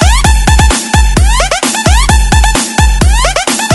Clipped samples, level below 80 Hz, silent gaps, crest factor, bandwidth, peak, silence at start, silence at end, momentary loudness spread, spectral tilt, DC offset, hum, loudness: 0.9%; -10 dBFS; none; 8 dB; 12 kHz; 0 dBFS; 0 s; 0 s; 2 LU; -3.5 dB/octave; under 0.1%; none; -9 LUFS